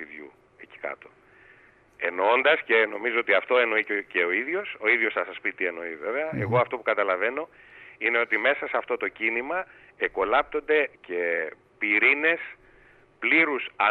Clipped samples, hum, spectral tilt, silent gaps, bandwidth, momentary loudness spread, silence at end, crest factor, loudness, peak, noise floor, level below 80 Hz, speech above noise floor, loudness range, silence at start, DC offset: under 0.1%; none; -7 dB/octave; none; 4.4 kHz; 13 LU; 0 s; 18 dB; -24 LUFS; -8 dBFS; -56 dBFS; -66 dBFS; 31 dB; 3 LU; 0 s; under 0.1%